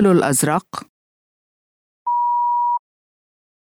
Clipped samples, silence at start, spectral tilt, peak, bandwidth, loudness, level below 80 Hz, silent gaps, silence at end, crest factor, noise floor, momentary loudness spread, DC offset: under 0.1%; 0 s; -5 dB/octave; -4 dBFS; over 20 kHz; -19 LUFS; -62 dBFS; 0.89-2.06 s; 1 s; 16 dB; under -90 dBFS; 15 LU; under 0.1%